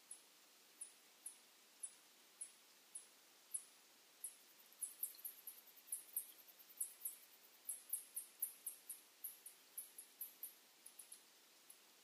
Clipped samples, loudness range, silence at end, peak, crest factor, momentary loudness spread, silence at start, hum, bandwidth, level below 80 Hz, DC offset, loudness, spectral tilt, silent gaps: under 0.1%; 6 LU; 0 s; -30 dBFS; 26 dB; 18 LU; 0 s; none; 15.5 kHz; under -90 dBFS; under 0.1%; -51 LUFS; 2.5 dB/octave; none